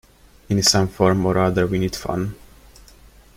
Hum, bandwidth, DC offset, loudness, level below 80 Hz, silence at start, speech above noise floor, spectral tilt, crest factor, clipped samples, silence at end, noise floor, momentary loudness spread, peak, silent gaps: none; 16 kHz; under 0.1%; -19 LUFS; -44 dBFS; 0.5 s; 29 dB; -4.5 dB/octave; 20 dB; under 0.1%; 1 s; -48 dBFS; 10 LU; -2 dBFS; none